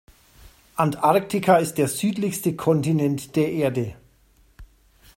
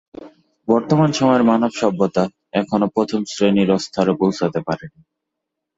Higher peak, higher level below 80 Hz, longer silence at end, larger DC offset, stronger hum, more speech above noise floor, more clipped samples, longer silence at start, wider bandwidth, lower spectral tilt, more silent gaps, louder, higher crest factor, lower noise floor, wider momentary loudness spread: about the same, -2 dBFS vs -2 dBFS; about the same, -54 dBFS vs -56 dBFS; second, 0.5 s vs 0.9 s; neither; neither; second, 37 dB vs 63 dB; neither; first, 0.75 s vs 0.2 s; first, 16.5 kHz vs 8 kHz; about the same, -6 dB/octave vs -6.5 dB/octave; neither; second, -22 LUFS vs -18 LUFS; about the same, 20 dB vs 16 dB; second, -58 dBFS vs -80 dBFS; about the same, 6 LU vs 8 LU